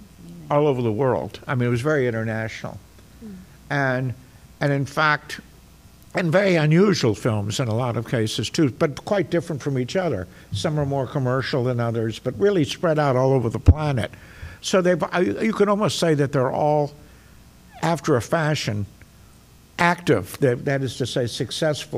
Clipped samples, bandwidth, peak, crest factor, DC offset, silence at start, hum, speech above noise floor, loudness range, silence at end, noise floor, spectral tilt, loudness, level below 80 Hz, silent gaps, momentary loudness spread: under 0.1%; 16 kHz; -4 dBFS; 18 dB; under 0.1%; 0 s; none; 28 dB; 4 LU; 0 s; -50 dBFS; -6 dB/octave; -22 LUFS; -40 dBFS; none; 12 LU